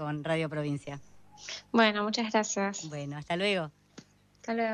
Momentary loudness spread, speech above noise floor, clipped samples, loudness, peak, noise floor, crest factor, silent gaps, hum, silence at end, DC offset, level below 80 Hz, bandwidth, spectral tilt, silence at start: 17 LU; 25 dB; under 0.1%; -30 LUFS; -12 dBFS; -56 dBFS; 20 dB; none; 50 Hz at -55 dBFS; 0 s; under 0.1%; -68 dBFS; 10 kHz; -4 dB/octave; 0 s